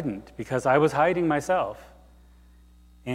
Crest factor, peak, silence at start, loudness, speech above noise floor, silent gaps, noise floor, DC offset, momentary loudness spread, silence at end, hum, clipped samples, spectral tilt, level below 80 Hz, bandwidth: 20 dB; -8 dBFS; 0 s; -24 LUFS; 29 dB; none; -53 dBFS; under 0.1%; 16 LU; 0 s; 60 Hz at -50 dBFS; under 0.1%; -6.5 dB/octave; -54 dBFS; 15.5 kHz